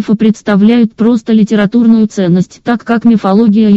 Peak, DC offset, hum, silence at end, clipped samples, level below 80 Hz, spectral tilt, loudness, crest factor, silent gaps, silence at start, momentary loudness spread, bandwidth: 0 dBFS; 0.2%; none; 0 s; under 0.1%; -48 dBFS; -7.5 dB/octave; -9 LUFS; 8 dB; none; 0 s; 5 LU; 7.8 kHz